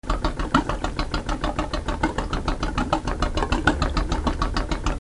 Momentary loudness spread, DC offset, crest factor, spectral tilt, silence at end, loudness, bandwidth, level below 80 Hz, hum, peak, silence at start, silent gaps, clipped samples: 6 LU; 0.4%; 22 dB; -5.5 dB/octave; 0.05 s; -25 LUFS; 11.5 kHz; -28 dBFS; none; -2 dBFS; 0.05 s; none; under 0.1%